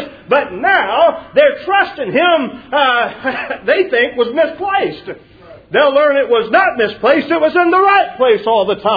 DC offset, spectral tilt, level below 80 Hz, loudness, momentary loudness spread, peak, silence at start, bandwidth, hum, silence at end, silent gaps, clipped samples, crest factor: under 0.1%; -6.5 dB/octave; -52 dBFS; -13 LUFS; 7 LU; 0 dBFS; 0 s; 5 kHz; none; 0 s; none; under 0.1%; 14 dB